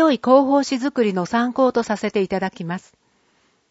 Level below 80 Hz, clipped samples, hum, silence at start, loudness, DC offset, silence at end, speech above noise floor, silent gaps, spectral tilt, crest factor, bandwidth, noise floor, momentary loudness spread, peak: -60 dBFS; under 0.1%; none; 0 s; -19 LUFS; under 0.1%; 0.9 s; 43 dB; none; -5.5 dB/octave; 18 dB; 8 kHz; -62 dBFS; 12 LU; -2 dBFS